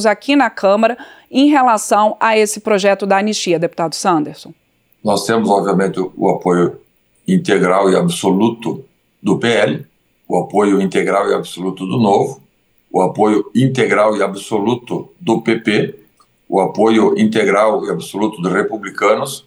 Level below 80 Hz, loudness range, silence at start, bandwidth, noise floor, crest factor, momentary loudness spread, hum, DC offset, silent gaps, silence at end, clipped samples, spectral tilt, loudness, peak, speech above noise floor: -64 dBFS; 3 LU; 0 s; 19.5 kHz; -53 dBFS; 14 dB; 9 LU; none; under 0.1%; none; 0.05 s; under 0.1%; -5.5 dB/octave; -15 LUFS; 0 dBFS; 39 dB